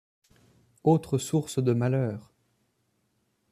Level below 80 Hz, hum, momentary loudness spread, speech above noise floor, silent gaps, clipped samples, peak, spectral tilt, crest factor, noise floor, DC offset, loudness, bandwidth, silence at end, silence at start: -66 dBFS; none; 6 LU; 48 dB; none; under 0.1%; -10 dBFS; -7 dB/octave; 20 dB; -73 dBFS; under 0.1%; -27 LUFS; 14 kHz; 1.3 s; 0.85 s